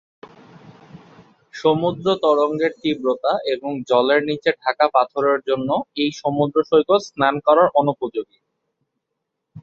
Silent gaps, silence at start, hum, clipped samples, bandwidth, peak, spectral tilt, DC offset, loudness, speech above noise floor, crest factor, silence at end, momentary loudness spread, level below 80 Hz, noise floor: none; 0.95 s; none; under 0.1%; 7.4 kHz; -2 dBFS; -6 dB/octave; under 0.1%; -19 LUFS; 60 dB; 18 dB; 0 s; 7 LU; -62 dBFS; -78 dBFS